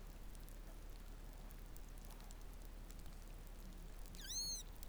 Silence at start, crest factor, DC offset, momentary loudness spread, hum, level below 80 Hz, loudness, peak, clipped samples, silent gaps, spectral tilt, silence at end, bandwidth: 0 s; 22 dB; under 0.1%; 14 LU; none; -54 dBFS; -52 LUFS; -30 dBFS; under 0.1%; none; -2 dB/octave; 0 s; over 20 kHz